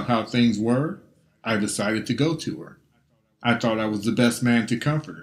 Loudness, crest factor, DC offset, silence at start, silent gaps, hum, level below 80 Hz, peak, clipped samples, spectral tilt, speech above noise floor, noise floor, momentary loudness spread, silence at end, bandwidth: -23 LUFS; 20 dB; under 0.1%; 0 s; none; none; -60 dBFS; -4 dBFS; under 0.1%; -5.5 dB/octave; 42 dB; -65 dBFS; 10 LU; 0 s; 15 kHz